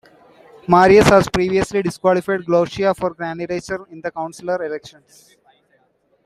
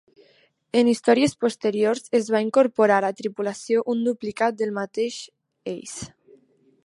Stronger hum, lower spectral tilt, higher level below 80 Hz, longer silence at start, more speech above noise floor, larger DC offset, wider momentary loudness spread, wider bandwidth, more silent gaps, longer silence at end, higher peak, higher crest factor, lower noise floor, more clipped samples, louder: neither; about the same, -5.5 dB/octave vs -4.5 dB/octave; first, -44 dBFS vs -66 dBFS; about the same, 0.7 s vs 0.75 s; first, 44 dB vs 39 dB; neither; about the same, 17 LU vs 16 LU; first, 14 kHz vs 11.5 kHz; neither; first, 1.4 s vs 0.8 s; first, 0 dBFS vs -4 dBFS; about the same, 18 dB vs 18 dB; about the same, -61 dBFS vs -61 dBFS; neither; first, -17 LUFS vs -22 LUFS